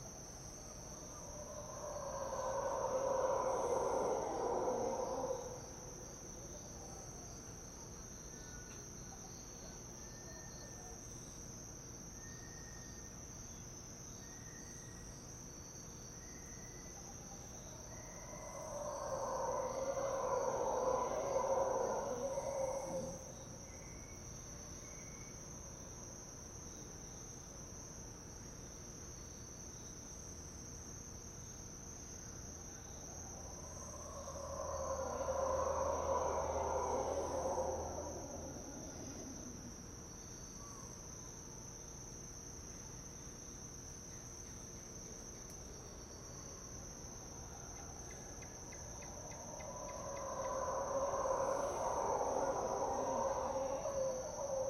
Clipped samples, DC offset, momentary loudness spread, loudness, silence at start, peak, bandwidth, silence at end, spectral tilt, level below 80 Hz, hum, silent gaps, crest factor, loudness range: under 0.1%; under 0.1%; 13 LU; -44 LUFS; 0 s; -24 dBFS; 15.5 kHz; 0 s; -4 dB/octave; -60 dBFS; none; none; 20 dB; 11 LU